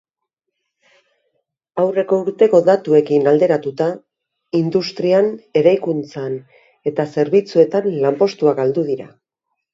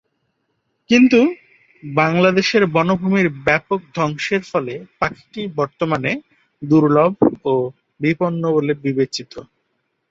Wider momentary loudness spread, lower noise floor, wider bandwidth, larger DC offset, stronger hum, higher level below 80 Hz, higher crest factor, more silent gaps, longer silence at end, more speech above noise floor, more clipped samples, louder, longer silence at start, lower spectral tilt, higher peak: about the same, 12 LU vs 14 LU; first, -79 dBFS vs -70 dBFS; about the same, 7.6 kHz vs 7.8 kHz; neither; neither; second, -66 dBFS vs -54 dBFS; about the same, 16 dB vs 16 dB; neither; about the same, 0.65 s vs 0.7 s; first, 63 dB vs 53 dB; neither; about the same, -17 LUFS vs -18 LUFS; first, 1.75 s vs 0.9 s; about the same, -7.5 dB/octave vs -6.5 dB/octave; about the same, 0 dBFS vs -2 dBFS